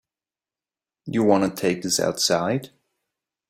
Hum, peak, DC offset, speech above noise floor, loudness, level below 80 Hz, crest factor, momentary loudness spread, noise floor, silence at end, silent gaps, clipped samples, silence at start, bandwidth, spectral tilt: none; -4 dBFS; under 0.1%; over 68 dB; -22 LUFS; -64 dBFS; 20 dB; 9 LU; under -90 dBFS; 0.85 s; none; under 0.1%; 1.05 s; 16 kHz; -4 dB/octave